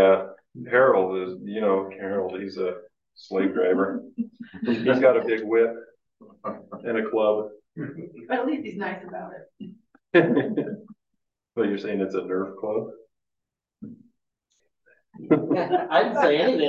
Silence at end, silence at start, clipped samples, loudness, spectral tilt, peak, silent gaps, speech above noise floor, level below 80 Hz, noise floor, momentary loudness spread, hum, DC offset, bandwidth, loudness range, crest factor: 0 s; 0 s; under 0.1%; -24 LUFS; -7.5 dB/octave; -4 dBFS; none; 61 dB; -70 dBFS; -85 dBFS; 21 LU; none; under 0.1%; 7 kHz; 7 LU; 20 dB